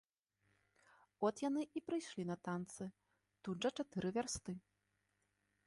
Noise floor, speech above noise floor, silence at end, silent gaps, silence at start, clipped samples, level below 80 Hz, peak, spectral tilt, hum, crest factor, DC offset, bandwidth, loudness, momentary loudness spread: -84 dBFS; 42 dB; 1.1 s; none; 1.2 s; under 0.1%; -74 dBFS; -24 dBFS; -5 dB/octave; 50 Hz at -75 dBFS; 20 dB; under 0.1%; 11.5 kHz; -43 LUFS; 11 LU